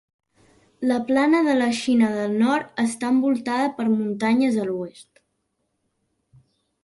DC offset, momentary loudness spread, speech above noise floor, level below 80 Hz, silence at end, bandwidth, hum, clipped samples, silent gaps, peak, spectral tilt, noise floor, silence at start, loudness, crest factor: under 0.1%; 7 LU; 53 dB; -66 dBFS; 1.8 s; 11.5 kHz; none; under 0.1%; none; -8 dBFS; -5 dB/octave; -74 dBFS; 0.8 s; -21 LUFS; 16 dB